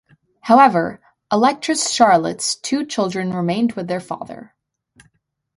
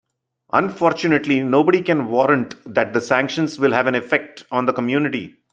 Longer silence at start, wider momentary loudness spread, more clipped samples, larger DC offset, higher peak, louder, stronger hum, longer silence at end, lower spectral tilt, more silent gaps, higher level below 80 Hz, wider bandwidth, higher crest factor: about the same, 0.45 s vs 0.55 s; first, 17 LU vs 6 LU; neither; neither; about the same, 0 dBFS vs -2 dBFS; about the same, -17 LUFS vs -19 LUFS; neither; first, 1.15 s vs 0.25 s; second, -4 dB/octave vs -6 dB/octave; neither; about the same, -62 dBFS vs -62 dBFS; first, 11.5 kHz vs 8.8 kHz; about the same, 18 dB vs 18 dB